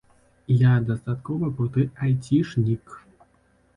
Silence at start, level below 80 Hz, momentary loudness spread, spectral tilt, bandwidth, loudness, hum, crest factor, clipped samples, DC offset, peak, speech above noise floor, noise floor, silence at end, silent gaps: 0.5 s; -54 dBFS; 9 LU; -9 dB/octave; 10 kHz; -23 LUFS; none; 16 dB; under 0.1%; under 0.1%; -8 dBFS; 40 dB; -62 dBFS; 0.8 s; none